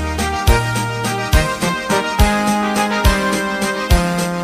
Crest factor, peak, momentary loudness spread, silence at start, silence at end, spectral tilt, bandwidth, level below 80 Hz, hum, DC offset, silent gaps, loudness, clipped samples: 14 dB; -2 dBFS; 4 LU; 0 s; 0 s; -4.5 dB/octave; 15.5 kHz; -22 dBFS; none; under 0.1%; none; -17 LUFS; under 0.1%